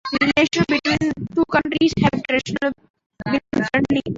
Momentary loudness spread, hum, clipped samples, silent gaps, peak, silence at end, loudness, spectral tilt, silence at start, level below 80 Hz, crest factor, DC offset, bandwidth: 7 LU; none; under 0.1%; 2.90-2.94 s, 3.06-3.10 s; -2 dBFS; 0 s; -20 LUFS; -5.5 dB/octave; 0.05 s; -46 dBFS; 18 dB; under 0.1%; 7.8 kHz